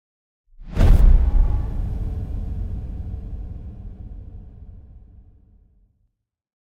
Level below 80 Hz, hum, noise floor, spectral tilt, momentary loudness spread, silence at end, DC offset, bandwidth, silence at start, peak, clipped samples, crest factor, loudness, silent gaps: -22 dBFS; none; -72 dBFS; -8.5 dB/octave; 24 LU; 1.9 s; under 0.1%; 4.9 kHz; 0.6 s; -4 dBFS; under 0.1%; 16 dB; -23 LUFS; none